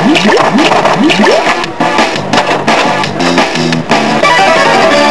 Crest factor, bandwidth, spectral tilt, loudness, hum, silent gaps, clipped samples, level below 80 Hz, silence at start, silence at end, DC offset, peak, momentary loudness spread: 8 dB; 11 kHz; -4 dB/octave; -8 LUFS; none; none; 0.9%; -42 dBFS; 0 s; 0 s; 4%; 0 dBFS; 5 LU